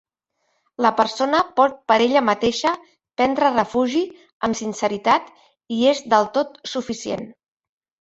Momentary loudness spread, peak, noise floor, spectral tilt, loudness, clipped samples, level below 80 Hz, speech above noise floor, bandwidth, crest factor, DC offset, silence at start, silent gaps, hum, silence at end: 12 LU; -2 dBFS; -72 dBFS; -4 dB/octave; -20 LUFS; under 0.1%; -58 dBFS; 53 dB; 8.2 kHz; 18 dB; under 0.1%; 0.8 s; 4.33-4.40 s; none; 0.7 s